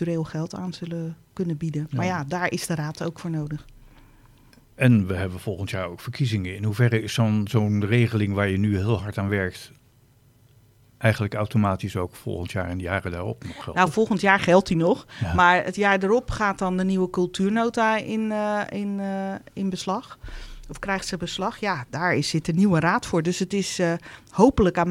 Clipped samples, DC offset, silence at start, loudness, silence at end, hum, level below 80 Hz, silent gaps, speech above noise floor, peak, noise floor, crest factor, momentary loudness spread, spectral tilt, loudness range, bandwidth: under 0.1%; under 0.1%; 0 s; -24 LUFS; 0 s; none; -46 dBFS; none; 34 dB; -2 dBFS; -57 dBFS; 22 dB; 12 LU; -6 dB/octave; 8 LU; 15.5 kHz